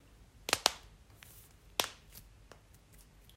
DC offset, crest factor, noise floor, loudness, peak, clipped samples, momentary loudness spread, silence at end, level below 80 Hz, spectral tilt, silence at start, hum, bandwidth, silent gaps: under 0.1%; 40 dB; -60 dBFS; -34 LUFS; -2 dBFS; under 0.1%; 25 LU; 0.35 s; -62 dBFS; -0.5 dB/octave; 0.5 s; none; 16 kHz; none